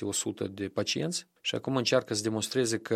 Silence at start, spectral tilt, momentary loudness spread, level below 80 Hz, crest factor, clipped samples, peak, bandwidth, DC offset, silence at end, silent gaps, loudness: 0 s; -3.5 dB/octave; 7 LU; -70 dBFS; 20 dB; under 0.1%; -10 dBFS; 15.5 kHz; under 0.1%; 0 s; none; -30 LUFS